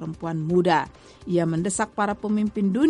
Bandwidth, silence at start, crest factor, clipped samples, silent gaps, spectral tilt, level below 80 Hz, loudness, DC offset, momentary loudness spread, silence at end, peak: 11.5 kHz; 0 s; 16 dB; under 0.1%; none; -6 dB/octave; -54 dBFS; -24 LUFS; under 0.1%; 9 LU; 0 s; -8 dBFS